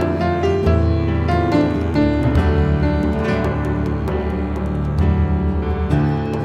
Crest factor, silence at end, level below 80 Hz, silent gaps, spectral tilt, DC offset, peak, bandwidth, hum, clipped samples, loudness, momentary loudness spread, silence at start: 14 dB; 0 s; -24 dBFS; none; -8.5 dB/octave; under 0.1%; -2 dBFS; 7.8 kHz; none; under 0.1%; -18 LUFS; 5 LU; 0 s